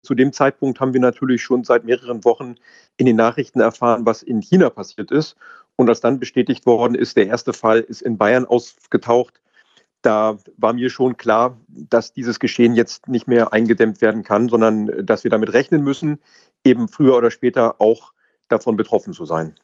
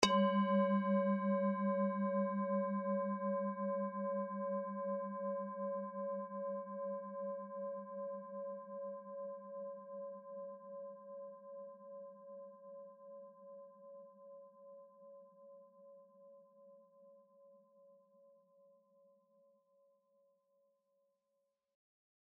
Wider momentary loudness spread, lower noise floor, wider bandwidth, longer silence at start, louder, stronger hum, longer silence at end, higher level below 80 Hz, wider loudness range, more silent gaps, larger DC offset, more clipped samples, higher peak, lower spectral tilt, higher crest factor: second, 7 LU vs 23 LU; second, -56 dBFS vs -86 dBFS; first, 7.8 kHz vs 4.6 kHz; about the same, 0.1 s vs 0 s; first, -17 LUFS vs -40 LUFS; neither; second, 0.15 s vs 4.3 s; first, -64 dBFS vs -86 dBFS; second, 2 LU vs 23 LU; neither; neither; neither; first, 0 dBFS vs -12 dBFS; about the same, -6.5 dB/octave vs -5.5 dB/octave; second, 18 dB vs 30 dB